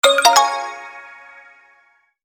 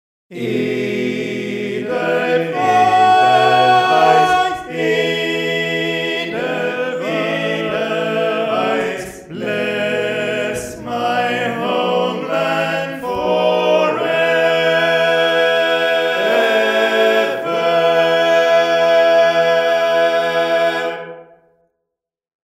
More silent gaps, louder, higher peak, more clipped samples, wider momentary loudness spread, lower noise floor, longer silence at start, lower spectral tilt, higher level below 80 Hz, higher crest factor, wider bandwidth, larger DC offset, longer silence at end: neither; about the same, -14 LUFS vs -16 LUFS; about the same, -2 dBFS vs 0 dBFS; neither; first, 26 LU vs 10 LU; second, -58 dBFS vs -82 dBFS; second, 0.05 s vs 0.3 s; second, 1.5 dB/octave vs -4.5 dB/octave; second, -66 dBFS vs -56 dBFS; about the same, 18 dB vs 16 dB; first, over 20 kHz vs 15.5 kHz; neither; about the same, 1.35 s vs 1.35 s